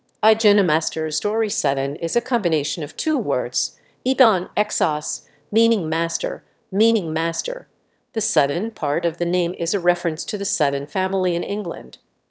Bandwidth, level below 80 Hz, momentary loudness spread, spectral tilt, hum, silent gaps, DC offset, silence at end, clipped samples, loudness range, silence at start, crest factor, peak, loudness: 8 kHz; -72 dBFS; 11 LU; -3.5 dB/octave; none; none; under 0.1%; 0.4 s; under 0.1%; 2 LU; 0.25 s; 20 dB; -2 dBFS; -21 LUFS